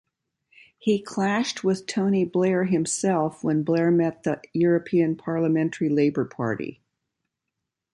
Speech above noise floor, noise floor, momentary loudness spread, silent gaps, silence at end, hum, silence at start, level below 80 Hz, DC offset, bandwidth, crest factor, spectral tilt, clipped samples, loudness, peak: 60 dB; -83 dBFS; 6 LU; none; 1.2 s; none; 0.85 s; -66 dBFS; under 0.1%; 11.5 kHz; 14 dB; -6 dB/octave; under 0.1%; -24 LUFS; -10 dBFS